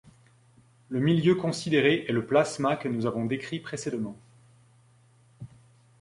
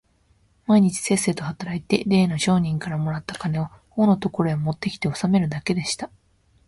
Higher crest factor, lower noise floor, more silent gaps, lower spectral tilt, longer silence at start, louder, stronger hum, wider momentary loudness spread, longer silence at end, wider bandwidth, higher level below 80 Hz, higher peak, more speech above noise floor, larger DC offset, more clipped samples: about the same, 20 dB vs 20 dB; about the same, -60 dBFS vs -61 dBFS; neither; about the same, -6 dB/octave vs -5.5 dB/octave; first, 0.9 s vs 0.7 s; second, -27 LUFS vs -23 LUFS; neither; first, 17 LU vs 10 LU; about the same, 0.55 s vs 0.6 s; about the same, 11.5 kHz vs 11.5 kHz; second, -64 dBFS vs -54 dBFS; second, -8 dBFS vs -4 dBFS; second, 34 dB vs 40 dB; neither; neither